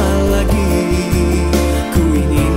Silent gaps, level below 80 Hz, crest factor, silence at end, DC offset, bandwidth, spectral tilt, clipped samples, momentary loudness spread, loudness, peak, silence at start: none; -18 dBFS; 12 dB; 0 s; under 0.1%; 16.5 kHz; -6 dB/octave; under 0.1%; 1 LU; -15 LUFS; 0 dBFS; 0 s